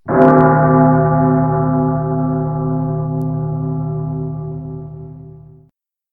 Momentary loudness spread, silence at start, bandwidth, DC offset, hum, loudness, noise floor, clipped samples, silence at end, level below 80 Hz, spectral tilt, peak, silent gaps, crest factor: 17 LU; 0.05 s; 2.6 kHz; 0.2%; none; -15 LUFS; -56 dBFS; under 0.1%; 0.75 s; -40 dBFS; -12.5 dB/octave; 0 dBFS; none; 16 dB